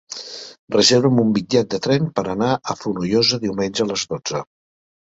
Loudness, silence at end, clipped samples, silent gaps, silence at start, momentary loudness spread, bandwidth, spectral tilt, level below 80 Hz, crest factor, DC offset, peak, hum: -19 LUFS; 0.6 s; under 0.1%; 0.59-0.68 s; 0.1 s; 14 LU; 8 kHz; -4.5 dB/octave; -54 dBFS; 18 dB; under 0.1%; -2 dBFS; none